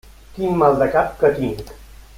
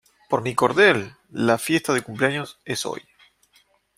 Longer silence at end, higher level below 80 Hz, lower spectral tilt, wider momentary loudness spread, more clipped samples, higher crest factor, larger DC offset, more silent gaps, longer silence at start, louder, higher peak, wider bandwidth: second, 0.3 s vs 1 s; first, -42 dBFS vs -62 dBFS; first, -7.5 dB/octave vs -4.5 dB/octave; about the same, 14 LU vs 13 LU; neither; about the same, 18 dB vs 22 dB; neither; neither; about the same, 0.35 s vs 0.3 s; first, -18 LUFS vs -22 LUFS; about the same, -2 dBFS vs -2 dBFS; about the same, 16.5 kHz vs 16 kHz